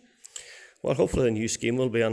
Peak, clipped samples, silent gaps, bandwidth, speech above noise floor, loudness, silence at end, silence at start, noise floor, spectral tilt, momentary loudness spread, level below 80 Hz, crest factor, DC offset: -10 dBFS; under 0.1%; none; 11 kHz; 21 dB; -26 LUFS; 0 s; 0.35 s; -46 dBFS; -5 dB/octave; 18 LU; -48 dBFS; 16 dB; under 0.1%